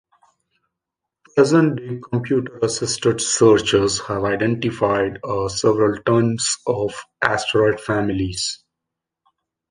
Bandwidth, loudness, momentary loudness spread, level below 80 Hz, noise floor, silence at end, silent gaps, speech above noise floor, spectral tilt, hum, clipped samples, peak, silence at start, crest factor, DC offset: 10.5 kHz; -19 LUFS; 9 LU; -48 dBFS; -83 dBFS; 1.15 s; none; 65 dB; -4.5 dB/octave; none; under 0.1%; 0 dBFS; 1.35 s; 20 dB; under 0.1%